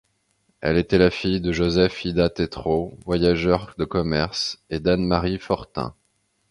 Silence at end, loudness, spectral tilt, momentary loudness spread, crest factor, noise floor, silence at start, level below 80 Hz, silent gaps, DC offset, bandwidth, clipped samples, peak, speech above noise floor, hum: 0.6 s; -22 LUFS; -6.5 dB/octave; 7 LU; 20 dB; -69 dBFS; 0.6 s; -40 dBFS; none; under 0.1%; 11 kHz; under 0.1%; -2 dBFS; 47 dB; none